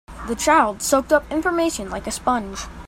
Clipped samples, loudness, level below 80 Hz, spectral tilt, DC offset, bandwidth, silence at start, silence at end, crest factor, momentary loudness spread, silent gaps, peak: under 0.1%; -20 LUFS; -40 dBFS; -3 dB/octave; under 0.1%; 16 kHz; 0.1 s; 0 s; 18 dB; 11 LU; none; -2 dBFS